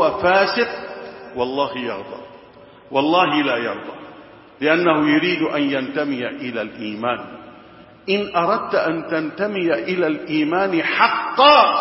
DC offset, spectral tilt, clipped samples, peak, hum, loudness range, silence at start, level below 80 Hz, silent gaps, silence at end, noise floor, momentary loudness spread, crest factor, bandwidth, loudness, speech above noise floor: under 0.1%; -8 dB/octave; under 0.1%; 0 dBFS; none; 4 LU; 0 s; -60 dBFS; none; 0 s; -44 dBFS; 15 LU; 20 dB; 5.8 kHz; -19 LUFS; 26 dB